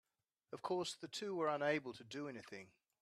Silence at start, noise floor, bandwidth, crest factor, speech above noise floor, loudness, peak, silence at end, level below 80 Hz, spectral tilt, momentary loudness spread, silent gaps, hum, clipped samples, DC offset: 0.5 s; -79 dBFS; 13.5 kHz; 20 dB; 36 dB; -43 LUFS; -24 dBFS; 0.35 s; -88 dBFS; -4 dB/octave; 16 LU; none; none; under 0.1%; under 0.1%